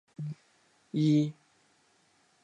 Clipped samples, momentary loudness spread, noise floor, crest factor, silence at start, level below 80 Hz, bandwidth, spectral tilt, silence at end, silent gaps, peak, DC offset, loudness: under 0.1%; 15 LU; -68 dBFS; 18 dB; 0.2 s; -82 dBFS; 9 kHz; -8 dB/octave; 1.1 s; none; -16 dBFS; under 0.1%; -30 LUFS